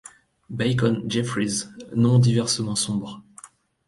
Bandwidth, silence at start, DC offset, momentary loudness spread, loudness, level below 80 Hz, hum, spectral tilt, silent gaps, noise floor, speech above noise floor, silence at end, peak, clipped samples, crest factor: 11.5 kHz; 0.5 s; under 0.1%; 12 LU; -23 LUFS; -56 dBFS; none; -5 dB/octave; none; -49 dBFS; 27 dB; 0.4 s; -6 dBFS; under 0.1%; 16 dB